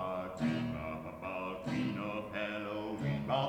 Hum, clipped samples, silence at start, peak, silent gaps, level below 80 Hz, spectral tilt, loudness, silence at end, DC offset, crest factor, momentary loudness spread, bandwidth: none; under 0.1%; 0 s; -20 dBFS; none; -62 dBFS; -7 dB/octave; -38 LUFS; 0 s; under 0.1%; 16 dB; 6 LU; 18 kHz